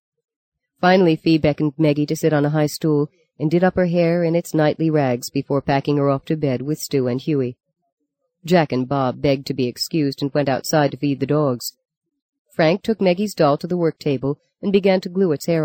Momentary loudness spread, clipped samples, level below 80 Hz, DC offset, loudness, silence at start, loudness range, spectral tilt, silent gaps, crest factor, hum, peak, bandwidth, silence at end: 6 LU; under 0.1%; -52 dBFS; under 0.1%; -19 LUFS; 0.8 s; 3 LU; -6.5 dB/octave; 7.92-7.97 s, 11.97-12.01 s, 12.22-12.33 s, 12.39-12.45 s; 16 dB; none; -2 dBFS; 17 kHz; 0 s